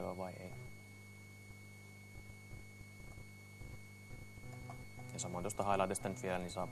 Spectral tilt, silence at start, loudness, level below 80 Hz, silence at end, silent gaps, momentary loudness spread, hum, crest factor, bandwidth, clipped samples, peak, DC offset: -5 dB/octave; 0 s; -44 LUFS; -62 dBFS; 0 s; none; 18 LU; 50 Hz at -60 dBFS; 24 dB; 13 kHz; under 0.1%; -20 dBFS; under 0.1%